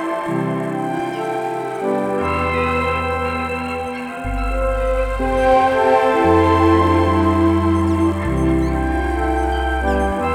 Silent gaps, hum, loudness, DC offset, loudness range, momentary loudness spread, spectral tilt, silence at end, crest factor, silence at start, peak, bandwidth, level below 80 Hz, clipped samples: none; none; -18 LUFS; under 0.1%; 6 LU; 9 LU; -7 dB/octave; 0 s; 14 dB; 0 s; -2 dBFS; 13.5 kHz; -28 dBFS; under 0.1%